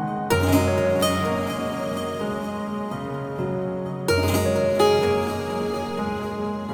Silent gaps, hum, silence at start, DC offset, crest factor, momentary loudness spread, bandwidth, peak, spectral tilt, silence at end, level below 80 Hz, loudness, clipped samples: none; none; 0 s; under 0.1%; 18 dB; 9 LU; over 20 kHz; -6 dBFS; -5.5 dB/octave; 0 s; -50 dBFS; -24 LUFS; under 0.1%